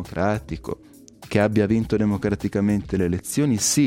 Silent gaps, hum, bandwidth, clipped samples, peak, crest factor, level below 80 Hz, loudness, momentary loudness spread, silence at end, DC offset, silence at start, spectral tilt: none; none; 16.5 kHz; under 0.1%; -6 dBFS; 16 dB; -44 dBFS; -22 LUFS; 12 LU; 0 s; under 0.1%; 0 s; -5 dB/octave